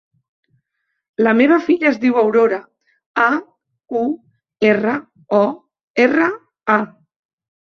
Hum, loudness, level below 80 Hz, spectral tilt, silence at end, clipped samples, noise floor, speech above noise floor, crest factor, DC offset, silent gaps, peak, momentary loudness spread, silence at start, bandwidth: none; -17 LUFS; -64 dBFS; -7 dB/octave; 0.8 s; under 0.1%; -73 dBFS; 58 dB; 16 dB; under 0.1%; 3.06-3.14 s, 5.83-5.94 s; -2 dBFS; 12 LU; 1.2 s; 7 kHz